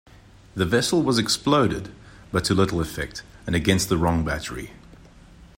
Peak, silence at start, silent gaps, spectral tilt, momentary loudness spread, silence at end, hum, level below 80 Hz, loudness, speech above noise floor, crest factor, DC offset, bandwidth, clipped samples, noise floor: -6 dBFS; 0.55 s; none; -4.5 dB/octave; 15 LU; 0.15 s; none; -42 dBFS; -23 LUFS; 26 dB; 18 dB; under 0.1%; 16.5 kHz; under 0.1%; -48 dBFS